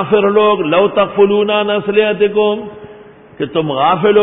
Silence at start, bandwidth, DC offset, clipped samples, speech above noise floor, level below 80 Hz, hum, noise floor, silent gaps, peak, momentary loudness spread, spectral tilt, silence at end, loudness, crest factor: 0 s; 3.9 kHz; under 0.1%; under 0.1%; 26 dB; -54 dBFS; none; -38 dBFS; none; 0 dBFS; 8 LU; -11 dB/octave; 0 s; -13 LUFS; 12 dB